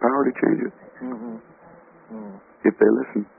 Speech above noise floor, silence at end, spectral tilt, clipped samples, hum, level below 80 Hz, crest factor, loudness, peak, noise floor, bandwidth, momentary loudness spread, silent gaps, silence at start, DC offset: 26 dB; 0.15 s; -3 dB/octave; under 0.1%; none; -68 dBFS; 20 dB; -22 LUFS; -4 dBFS; -49 dBFS; 2.8 kHz; 21 LU; none; 0 s; under 0.1%